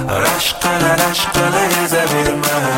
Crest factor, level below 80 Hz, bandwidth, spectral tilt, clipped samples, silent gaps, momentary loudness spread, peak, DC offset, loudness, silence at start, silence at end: 14 dB; -38 dBFS; 17 kHz; -3 dB/octave; under 0.1%; none; 2 LU; 0 dBFS; under 0.1%; -14 LUFS; 0 s; 0 s